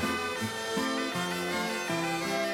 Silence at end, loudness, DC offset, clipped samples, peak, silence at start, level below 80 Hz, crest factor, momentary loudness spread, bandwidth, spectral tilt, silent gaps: 0 s; -31 LUFS; under 0.1%; under 0.1%; -18 dBFS; 0 s; -64 dBFS; 12 dB; 2 LU; 17.5 kHz; -3.5 dB/octave; none